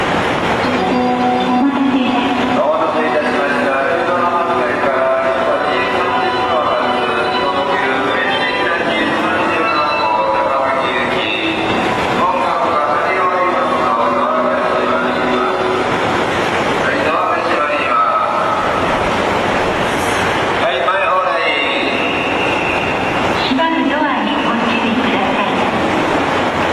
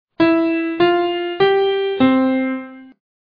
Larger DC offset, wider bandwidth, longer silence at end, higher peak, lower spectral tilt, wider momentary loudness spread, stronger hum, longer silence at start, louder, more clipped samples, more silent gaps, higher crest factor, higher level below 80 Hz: neither; first, 14 kHz vs 5 kHz; second, 0 s vs 0.5 s; about the same, -4 dBFS vs -2 dBFS; second, -4.5 dB/octave vs -8 dB/octave; second, 1 LU vs 7 LU; neither; second, 0 s vs 0.2 s; first, -14 LUFS vs -17 LUFS; neither; neither; about the same, 12 dB vs 14 dB; first, -44 dBFS vs -58 dBFS